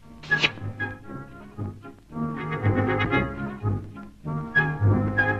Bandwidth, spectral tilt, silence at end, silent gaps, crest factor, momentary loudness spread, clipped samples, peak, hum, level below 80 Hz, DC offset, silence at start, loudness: 7.6 kHz; -6.5 dB/octave; 0 s; none; 18 dB; 17 LU; under 0.1%; -8 dBFS; none; -46 dBFS; under 0.1%; 0 s; -25 LUFS